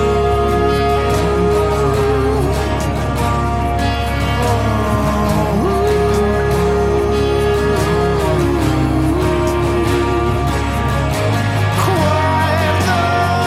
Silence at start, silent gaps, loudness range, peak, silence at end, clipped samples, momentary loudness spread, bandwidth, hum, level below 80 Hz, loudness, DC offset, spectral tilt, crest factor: 0 s; none; 1 LU; -2 dBFS; 0 s; under 0.1%; 3 LU; 16 kHz; none; -24 dBFS; -15 LUFS; under 0.1%; -6.5 dB/octave; 12 dB